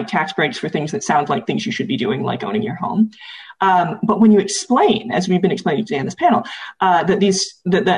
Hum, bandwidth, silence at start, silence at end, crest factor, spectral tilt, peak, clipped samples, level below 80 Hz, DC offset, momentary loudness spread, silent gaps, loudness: none; 10.5 kHz; 0 s; 0 s; 14 dB; -5 dB/octave; -4 dBFS; under 0.1%; -58 dBFS; under 0.1%; 7 LU; none; -17 LUFS